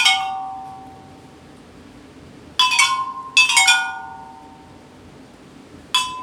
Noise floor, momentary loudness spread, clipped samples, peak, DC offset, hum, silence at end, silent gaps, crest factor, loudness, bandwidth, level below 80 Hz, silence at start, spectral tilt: -44 dBFS; 24 LU; under 0.1%; 0 dBFS; under 0.1%; none; 0 s; none; 22 dB; -16 LUFS; over 20 kHz; -60 dBFS; 0 s; 1.5 dB/octave